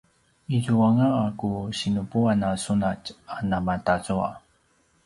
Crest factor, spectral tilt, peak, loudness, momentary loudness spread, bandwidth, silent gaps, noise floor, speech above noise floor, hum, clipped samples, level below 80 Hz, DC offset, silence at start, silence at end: 18 dB; -6.5 dB/octave; -8 dBFS; -25 LUFS; 11 LU; 11.5 kHz; none; -65 dBFS; 41 dB; none; under 0.1%; -50 dBFS; under 0.1%; 0.5 s; 0.65 s